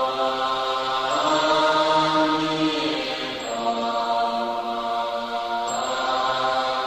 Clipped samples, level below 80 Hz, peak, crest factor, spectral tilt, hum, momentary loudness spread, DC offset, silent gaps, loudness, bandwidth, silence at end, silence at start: under 0.1%; -58 dBFS; -8 dBFS; 16 dB; -3.5 dB/octave; none; 7 LU; under 0.1%; none; -23 LUFS; 15.5 kHz; 0 s; 0 s